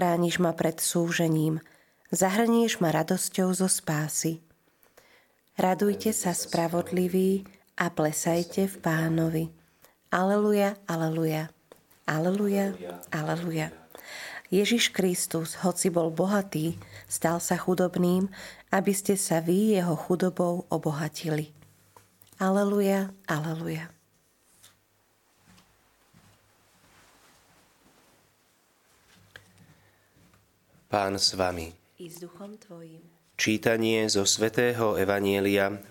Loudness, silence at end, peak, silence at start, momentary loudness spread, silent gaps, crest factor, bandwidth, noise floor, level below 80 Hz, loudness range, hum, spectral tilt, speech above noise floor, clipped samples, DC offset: -27 LUFS; 0.05 s; -6 dBFS; 0 s; 15 LU; none; 22 dB; 17 kHz; -67 dBFS; -66 dBFS; 5 LU; none; -4.5 dB/octave; 41 dB; under 0.1%; under 0.1%